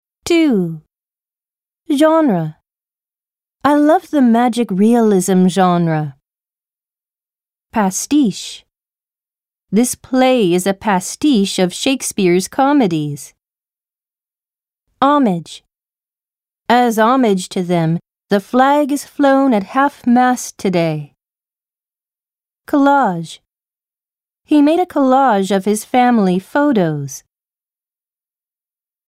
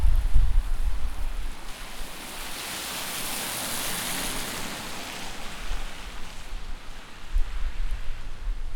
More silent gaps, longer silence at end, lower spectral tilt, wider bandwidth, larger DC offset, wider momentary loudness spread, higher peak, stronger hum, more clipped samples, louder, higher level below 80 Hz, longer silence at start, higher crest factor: neither; first, 1.9 s vs 0 s; first, -5.5 dB/octave vs -2.5 dB/octave; second, 16 kHz vs over 20 kHz; neither; second, 10 LU vs 13 LU; first, 0 dBFS vs -6 dBFS; neither; neither; first, -14 LUFS vs -32 LUFS; second, -58 dBFS vs -28 dBFS; first, 0.25 s vs 0 s; about the same, 16 dB vs 18 dB